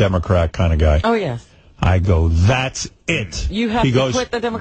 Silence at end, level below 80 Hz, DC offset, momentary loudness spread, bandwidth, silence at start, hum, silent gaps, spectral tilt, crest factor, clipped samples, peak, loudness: 0 s; -26 dBFS; under 0.1%; 8 LU; 8.8 kHz; 0 s; none; none; -6 dB/octave; 14 dB; under 0.1%; -4 dBFS; -18 LUFS